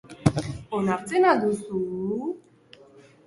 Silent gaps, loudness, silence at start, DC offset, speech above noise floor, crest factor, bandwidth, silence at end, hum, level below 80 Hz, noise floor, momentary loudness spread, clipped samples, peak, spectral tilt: none; -25 LUFS; 0.05 s; under 0.1%; 29 dB; 24 dB; 11.5 kHz; 0.85 s; none; -52 dBFS; -53 dBFS; 12 LU; under 0.1%; -2 dBFS; -6.5 dB/octave